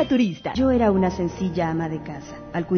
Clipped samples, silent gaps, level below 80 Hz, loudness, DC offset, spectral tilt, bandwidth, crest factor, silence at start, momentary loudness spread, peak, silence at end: under 0.1%; none; -42 dBFS; -23 LUFS; under 0.1%; -7.5 dB/octave; 6.6 kHz; 14 dB; 0 s; 13 LU; -8 dBFS; 0 s